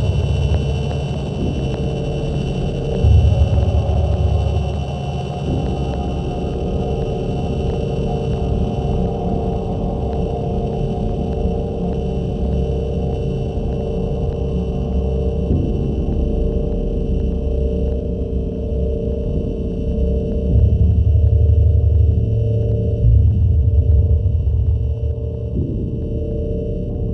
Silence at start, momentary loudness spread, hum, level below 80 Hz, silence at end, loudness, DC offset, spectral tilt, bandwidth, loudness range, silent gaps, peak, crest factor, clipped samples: 0 s; 8 LU; none; -20 dBFS; 0 s; -19 LUFS; under 0.1%; -9 dB/octave; 6.2 kHz; 6 LU; none; -2 dBFS; 14 dB; under 0.1%